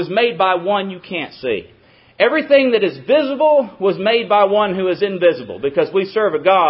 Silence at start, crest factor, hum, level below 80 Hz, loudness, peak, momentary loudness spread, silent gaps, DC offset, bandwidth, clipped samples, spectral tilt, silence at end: 0 s; 16 dB; none; -60 dBFS; -16 LUFS; 0 dBFS; 10 LU; none; under 0.1%; 5.8 kHz; under 0.1%; -10 dB/octave; 0 s